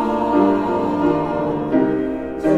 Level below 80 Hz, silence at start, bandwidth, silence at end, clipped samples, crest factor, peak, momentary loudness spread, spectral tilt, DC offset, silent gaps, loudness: -44 dBFS; 0 s; 8 kHz; 0 s; under 0.1%; 14 dB; -4 dBFS; 6 LU; -8.5 dB/octave; under 0.1%; none; -19 LUFS